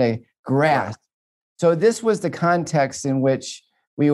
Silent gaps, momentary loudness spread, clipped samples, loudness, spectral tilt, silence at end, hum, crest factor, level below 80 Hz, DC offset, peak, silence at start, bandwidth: 0.39-0.44 s, 1.13-1.56 s, 3.87-3.97 s; 15 LU; under 0.1%; -20 LUFS; -6 dB/octave; 0 s; none; 16 dB; -66 dBFS; under 0.1%; -4 dBFS; 0 s; 12.5 kHz